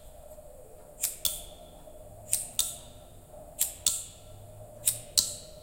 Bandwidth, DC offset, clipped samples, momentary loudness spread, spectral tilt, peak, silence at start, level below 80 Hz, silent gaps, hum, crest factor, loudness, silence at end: 17 kHz; under 0.1%; under 0.1%; 23 LU; 0 dB/octave; -2 dBFS; 0 s; -54 dBFS; none; none; 34 dB; -29 LUFS; 0 s